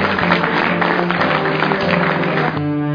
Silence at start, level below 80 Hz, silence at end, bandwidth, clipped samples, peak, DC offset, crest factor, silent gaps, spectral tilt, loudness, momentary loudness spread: 0 s; -52 dBFS; 0 s; 5.2 kHz; under 0.1%; 0 dBFS; under 0.1%; 16 dB; none; -7.5 dB/octave; -16 LUFS; 3 LU